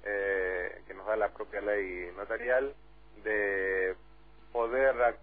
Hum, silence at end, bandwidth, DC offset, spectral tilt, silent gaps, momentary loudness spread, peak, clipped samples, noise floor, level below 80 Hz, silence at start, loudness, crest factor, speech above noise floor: none; 0.05 s; 4.7 kHz; 0.2%; -8 dB/octave; none; 12 LU; -14 dBFS; under 0.1%; -58 dBFS; -56 dBFS; 0 s; -32 LUFS; 18 dB; 27 dB